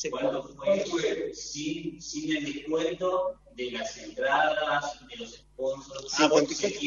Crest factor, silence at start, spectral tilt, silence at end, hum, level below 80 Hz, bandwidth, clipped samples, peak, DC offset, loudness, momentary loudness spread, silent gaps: 22 dB; 0 s; -3 dB/octave; 0 s; 50 Hz at -60 dBFS; -60 dBFS; 7.6 kHz; under 0.1%; -6 dBFS; under 0.1%; -29 LUFS; 13 LU; none